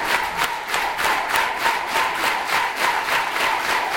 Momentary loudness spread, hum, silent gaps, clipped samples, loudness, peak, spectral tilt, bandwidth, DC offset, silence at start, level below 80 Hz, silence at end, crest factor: 3 LU; none; none; under 0.1%; -20 LUFS; -4 dBFS; -0.5 dB/octave; 19.5 kHz; under 0.1%; 0 s; -52 dBFS; 0 s; 18 dB